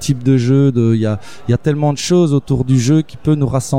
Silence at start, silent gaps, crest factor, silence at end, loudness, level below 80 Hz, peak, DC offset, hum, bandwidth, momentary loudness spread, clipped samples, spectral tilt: 0 s; none; 12 dB; 0 s; -14 LUFS; -42 dBFS; -2 dBFS; 2%; none; 13.5 kHz; 5 LU; under 0.1%; -7 dB/octave